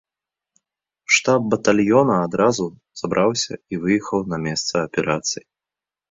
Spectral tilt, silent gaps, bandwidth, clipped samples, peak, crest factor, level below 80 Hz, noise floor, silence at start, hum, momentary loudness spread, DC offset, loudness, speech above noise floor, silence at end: -4 dB/octave; none; 7.8 kHz; under 0.1%; -2 dBFS; 18 dB; -56 dBFS; -89 dBFS; 1.1 s; none; 10 LU; under 0.1%; -20 LUFS; 69 dB; 0.75 s